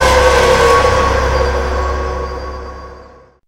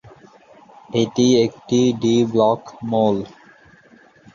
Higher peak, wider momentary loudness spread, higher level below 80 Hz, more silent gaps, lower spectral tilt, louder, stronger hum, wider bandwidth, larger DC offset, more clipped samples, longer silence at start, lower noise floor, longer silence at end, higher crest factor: first, 0 dBFS vs -4 dBFS; first, 18 LU vs 9 LU; first, -20 dBFS vs -58 dBFS; neither; second, -4 dB/octave vs -6 dB/octave; first, -12 LUFS vs -18 LUFS; neither; first, 16 kHz vs 7.4 kHz; neither; neither; second, 0 s vs 0.9 s; second, -40 dBFS vs -50 dBFS; second, 0.4 s vs 1.05 s; about the same, 12 dB vs 16 dB